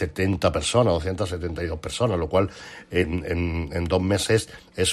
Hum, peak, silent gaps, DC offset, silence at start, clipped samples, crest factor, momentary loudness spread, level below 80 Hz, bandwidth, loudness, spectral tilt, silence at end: none; -6 dBFS; none; under 0.1%; 0 s; under 0.1%; 18 dB; 8 LU; -42 dBFS; 13.5 kHz; -24 LUFS; -5 dB/octave; 0 s